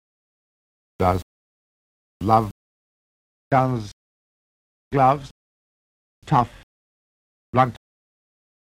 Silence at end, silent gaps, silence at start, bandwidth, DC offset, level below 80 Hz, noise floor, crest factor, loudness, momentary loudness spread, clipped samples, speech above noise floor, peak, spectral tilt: 0.95 s; 1.23-2.20 s, 2.51-3.51 s, 3.93-4.91 s, 5.31-6.22 s, 6.63-7.53 s; 1 s; 16 kHz; under 0.1%; -50 dBFS; under -90 dBFS; 22 dB; -22 LUFS; 10 LU; under 0.1%; over 71 dB; -2 dBFS; -7.5 dB/octave